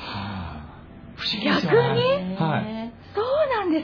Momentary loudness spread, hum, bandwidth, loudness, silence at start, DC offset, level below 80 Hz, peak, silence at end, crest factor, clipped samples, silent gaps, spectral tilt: 19 LU; none; 5.4 kHz; -23 LUFS; 0 s; under 0.1%; -50 dBFS; -6 dBFS; 0 s; 18 dB; under 0.1%; none; -7 dB/octave